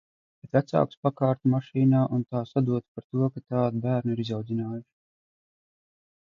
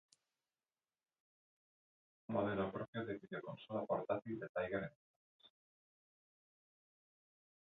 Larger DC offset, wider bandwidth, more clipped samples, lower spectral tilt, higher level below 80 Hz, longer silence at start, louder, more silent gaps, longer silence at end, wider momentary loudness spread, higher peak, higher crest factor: neither; about the same, 6.8 kHz vs 6.8 kHz; neither; first, -9.5 dB/octave vs -5.5 dB/octave; first, -64 dBFS vs -76 dBFS; second, 0.55 s vs 2.3 s; first, -27 LUFS vs -43 LUFS; second, 0.97-1.03 s, 2.88-2.95 s, 3.04-3.10 s vs 2.88-2.93 s, 4.49-4.55 s, 4.96-5.39 s; second, 1.55 s vs 2.25 s; about the same, 8 LU vs 9 LU; first, -8 dBFS vs -26 dBFS; about the same, 20 dB vs 22 dB